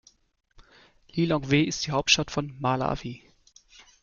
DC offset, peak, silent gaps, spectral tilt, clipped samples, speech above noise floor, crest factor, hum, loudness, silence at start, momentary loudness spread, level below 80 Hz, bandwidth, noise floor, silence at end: under 0.1%; -4 dBFS; none; -4 dB/octave; under 0.1%; 32 dB; 24 dB; none; -25 LUFS; 0.6 s; 13 LU; -52 dBFS; 7.4 kHz; -57 dBFS; 0.85 s